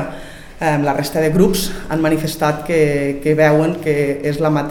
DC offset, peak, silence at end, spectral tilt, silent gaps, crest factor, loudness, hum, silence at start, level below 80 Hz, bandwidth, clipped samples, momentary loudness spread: 0.4%; 0 dBFS; 0 s; -6 dB/octave; none; 16 dB; -16 LUFS; none; 0 s; -36 dBFS; 18 kHz; under 0.1%; 8 LU